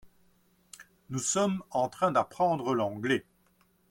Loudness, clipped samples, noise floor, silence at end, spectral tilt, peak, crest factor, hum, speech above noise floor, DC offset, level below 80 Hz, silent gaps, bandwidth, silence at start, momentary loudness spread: -29 LUFS; under 0.1%; -68 dBFS; 0.7 s; -4.5 dB/octave; -12 dBFS; 18 dB; none; 39 dB; under 0.1%; -70 dBFS; none; 16.5 kHz; 0.05 s; 16 LU